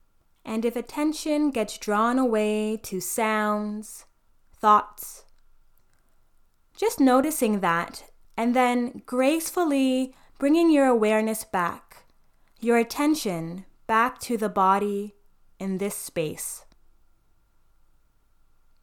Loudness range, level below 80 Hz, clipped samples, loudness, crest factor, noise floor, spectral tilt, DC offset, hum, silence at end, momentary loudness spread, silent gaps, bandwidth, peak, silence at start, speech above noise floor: 5 LU; -58 dBFS; under 0.1%; -24 LUFS; 20 dB; -61 dBFS; -4.5 dB/octave; under 0.1%; none; 2.25 s; 16 LU; none; 19 kHz; -6 dBFS; 0.45 s; 37 dB